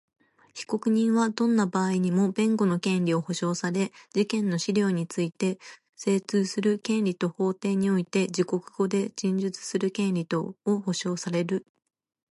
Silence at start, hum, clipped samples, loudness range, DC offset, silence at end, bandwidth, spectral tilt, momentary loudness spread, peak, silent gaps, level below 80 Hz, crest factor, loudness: 0.55 s; none; under 0.1%; 3 LU; under 0.1%; 0.7 s; 11.5 kHz; -6 dB/octave; 6 LU; -12 dBFS; none; -74 dBFS; 14 dB; -27 LUFS